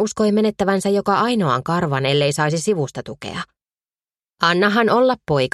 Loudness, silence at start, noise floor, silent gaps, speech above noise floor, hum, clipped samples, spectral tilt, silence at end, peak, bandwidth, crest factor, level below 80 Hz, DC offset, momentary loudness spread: -18 LUFS; 0 s; under -90 dBFS; none; over 72 dB; none; under 0.1%; -5 dB/octave; 0.05 s; 0 dBFS; 13 kHz; 18 dB; -54 dBFS; under 0.1%; 14 LU